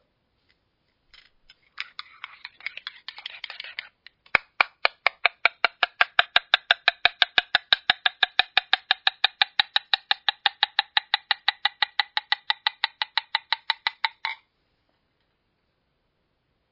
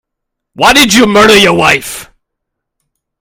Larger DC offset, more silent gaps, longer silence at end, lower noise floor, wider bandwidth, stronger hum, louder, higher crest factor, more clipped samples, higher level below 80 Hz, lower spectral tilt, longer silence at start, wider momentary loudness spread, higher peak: neither; neither; first, 2.35 s vs 1.15 s; about the same, -73 dBFS vs -74 dBFS; second, 6 kHz vs over 20 kHz; neither; second, -23 LUFS vs -6 LUFS; first, 26 dB vs 10 dB; second, under 0.1% vs 2%; second, -66 dBFS vs -38 dBFS; second, -1 dB/octave vs -3 dB/octave; first, 1.8 s vs 0.6 s; first, 16 LU vs 12 LU; about the same, 0 dBFS vs 0 dBFS